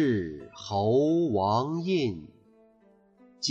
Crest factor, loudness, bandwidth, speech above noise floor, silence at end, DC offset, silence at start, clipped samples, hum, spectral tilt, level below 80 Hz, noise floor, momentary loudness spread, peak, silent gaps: 14 dB; -27 LUFS; 8 kHz; 35 dB; 0 s; under 0.1%; 0 s; under 0.1%; none; -6 dB/octave; -62 dBFS; -61 dBFS; 13 LU; -14 dBFS; none